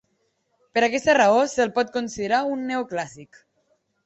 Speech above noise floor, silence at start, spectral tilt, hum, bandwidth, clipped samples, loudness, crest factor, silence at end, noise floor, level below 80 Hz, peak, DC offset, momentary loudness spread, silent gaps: 49 dB; 0.75 s; -3.5 dB/octave; none; 8.2 kHz; under 0.1%; -22 LUFS; 18 dB; 0.8 s; -71 dBFS; -62 dBFS; -6 dBFS; under 0.1%; 11 LU; none